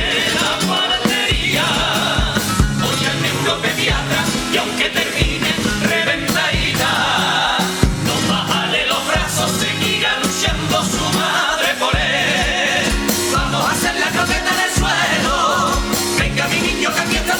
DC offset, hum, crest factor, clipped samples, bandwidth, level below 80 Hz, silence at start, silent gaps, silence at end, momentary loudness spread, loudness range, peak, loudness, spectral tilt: under 0.1%; none; 16 dB; under 0.1%; over 20 kHz; -28 dBFS; 0 s; none; 0 s; 2 LU; 1 LU; 0 dBFS; -16 LUFS; -3 dB/octave